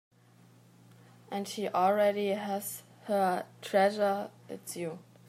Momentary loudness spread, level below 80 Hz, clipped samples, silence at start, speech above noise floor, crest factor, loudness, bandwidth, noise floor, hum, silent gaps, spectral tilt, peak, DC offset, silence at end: 14 LU; -86 dBFS; under 0.1%; 1.3 s; 29 dB; 18 dB; -31 LUFS; 16 kHz; -60 dBFS; none; none; -4.5 dB/octave; -14 dBFS; under 0.1%; 0.25 s